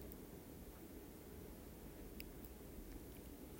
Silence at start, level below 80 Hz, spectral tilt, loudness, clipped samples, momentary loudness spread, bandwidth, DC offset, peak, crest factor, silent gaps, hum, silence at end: 0 s; -60 dBFS; -5.5 dB/octave; -56 LUFS; under 0.1%; 2 LU; 16 kHz; under 0.1%; -30 dBFS; 24 dB; none; none; 0 s